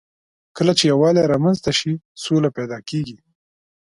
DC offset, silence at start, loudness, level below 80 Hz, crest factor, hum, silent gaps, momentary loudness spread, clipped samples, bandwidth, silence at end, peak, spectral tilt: under 0.1%; 0.55 s; -19 LUFS; -54 dBFS; 18 dB; none; 2.05-2.15 s; 12 LU; under 0.1%; 11.5 kHz; 0.7 s; -2 dBFS; -5.5 dB/octave